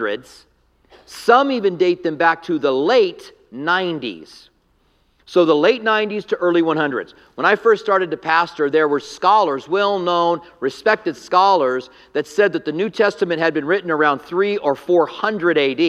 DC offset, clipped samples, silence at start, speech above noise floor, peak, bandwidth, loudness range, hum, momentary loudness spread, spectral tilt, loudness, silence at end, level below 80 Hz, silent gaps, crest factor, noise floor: under 0.1%; under 0.1%; 0 s; 43 dB; 0 dBFS; 12.5 kHz; 2 LU; none; 10 LU; -5 dB/octave; -18 LUFS; 0 s; -64 dBFS; none; 18 dB; -60 dBFS